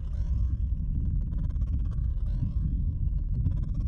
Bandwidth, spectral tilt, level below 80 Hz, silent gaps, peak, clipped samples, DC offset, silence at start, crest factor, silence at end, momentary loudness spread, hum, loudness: 1.7 kHz; -10.5 dB/octave; -28 dBFS; none; -16 dBFS; under 0.1%; under 0.1%; 0 s; 12 dB; 0 s; 2 LU; none; -31 LUFS